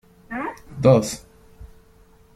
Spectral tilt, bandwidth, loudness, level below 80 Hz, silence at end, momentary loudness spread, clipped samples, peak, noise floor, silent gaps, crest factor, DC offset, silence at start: -6.5 dB/octave; 14.5 kHz; -21 LUFS; -50 dBFS; 0.7 s; 17 LU; under 0.1%; -2 dBFS; -53 dBFS; none; 22 dB; under 0.1%; 0.3 s